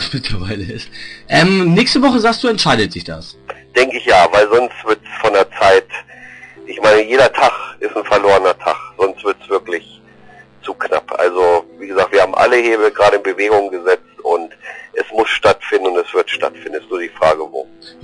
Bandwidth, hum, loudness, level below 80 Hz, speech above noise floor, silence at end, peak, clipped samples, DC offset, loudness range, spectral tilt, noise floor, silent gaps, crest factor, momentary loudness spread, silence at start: 10.5 kHz; none; -14 LUFS; -42 dBFS; 28 dB; 0.15 s; -2 dBFS; under 0.1%; under 0.1%; 4 LU; -5 dB/octave; -42 dBFS; none; 12 dB; 16 LU; 0 s